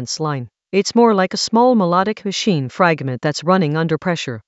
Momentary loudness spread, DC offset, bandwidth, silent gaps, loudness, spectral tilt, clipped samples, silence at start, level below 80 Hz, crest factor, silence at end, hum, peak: 8 LU; under 0.1%; 8.2 kHz; none; -17 LUFS; -5 dB/octave; under 0.1%; 0 s; -62 dBFS; 16 dB; 0.05 s; none; 0 dBFS